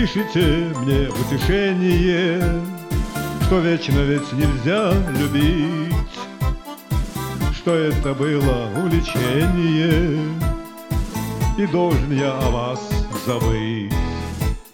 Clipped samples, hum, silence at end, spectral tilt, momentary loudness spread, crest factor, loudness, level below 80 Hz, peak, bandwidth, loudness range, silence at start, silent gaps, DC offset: under 0.1%; none; 0.05 s; -6.5 dB/octave; 8 LU; 14 dB; -20 LUFS; -28 dBFS; -4 dBFS; 18 kHz; 2 LU; 0 s; none; 0.1%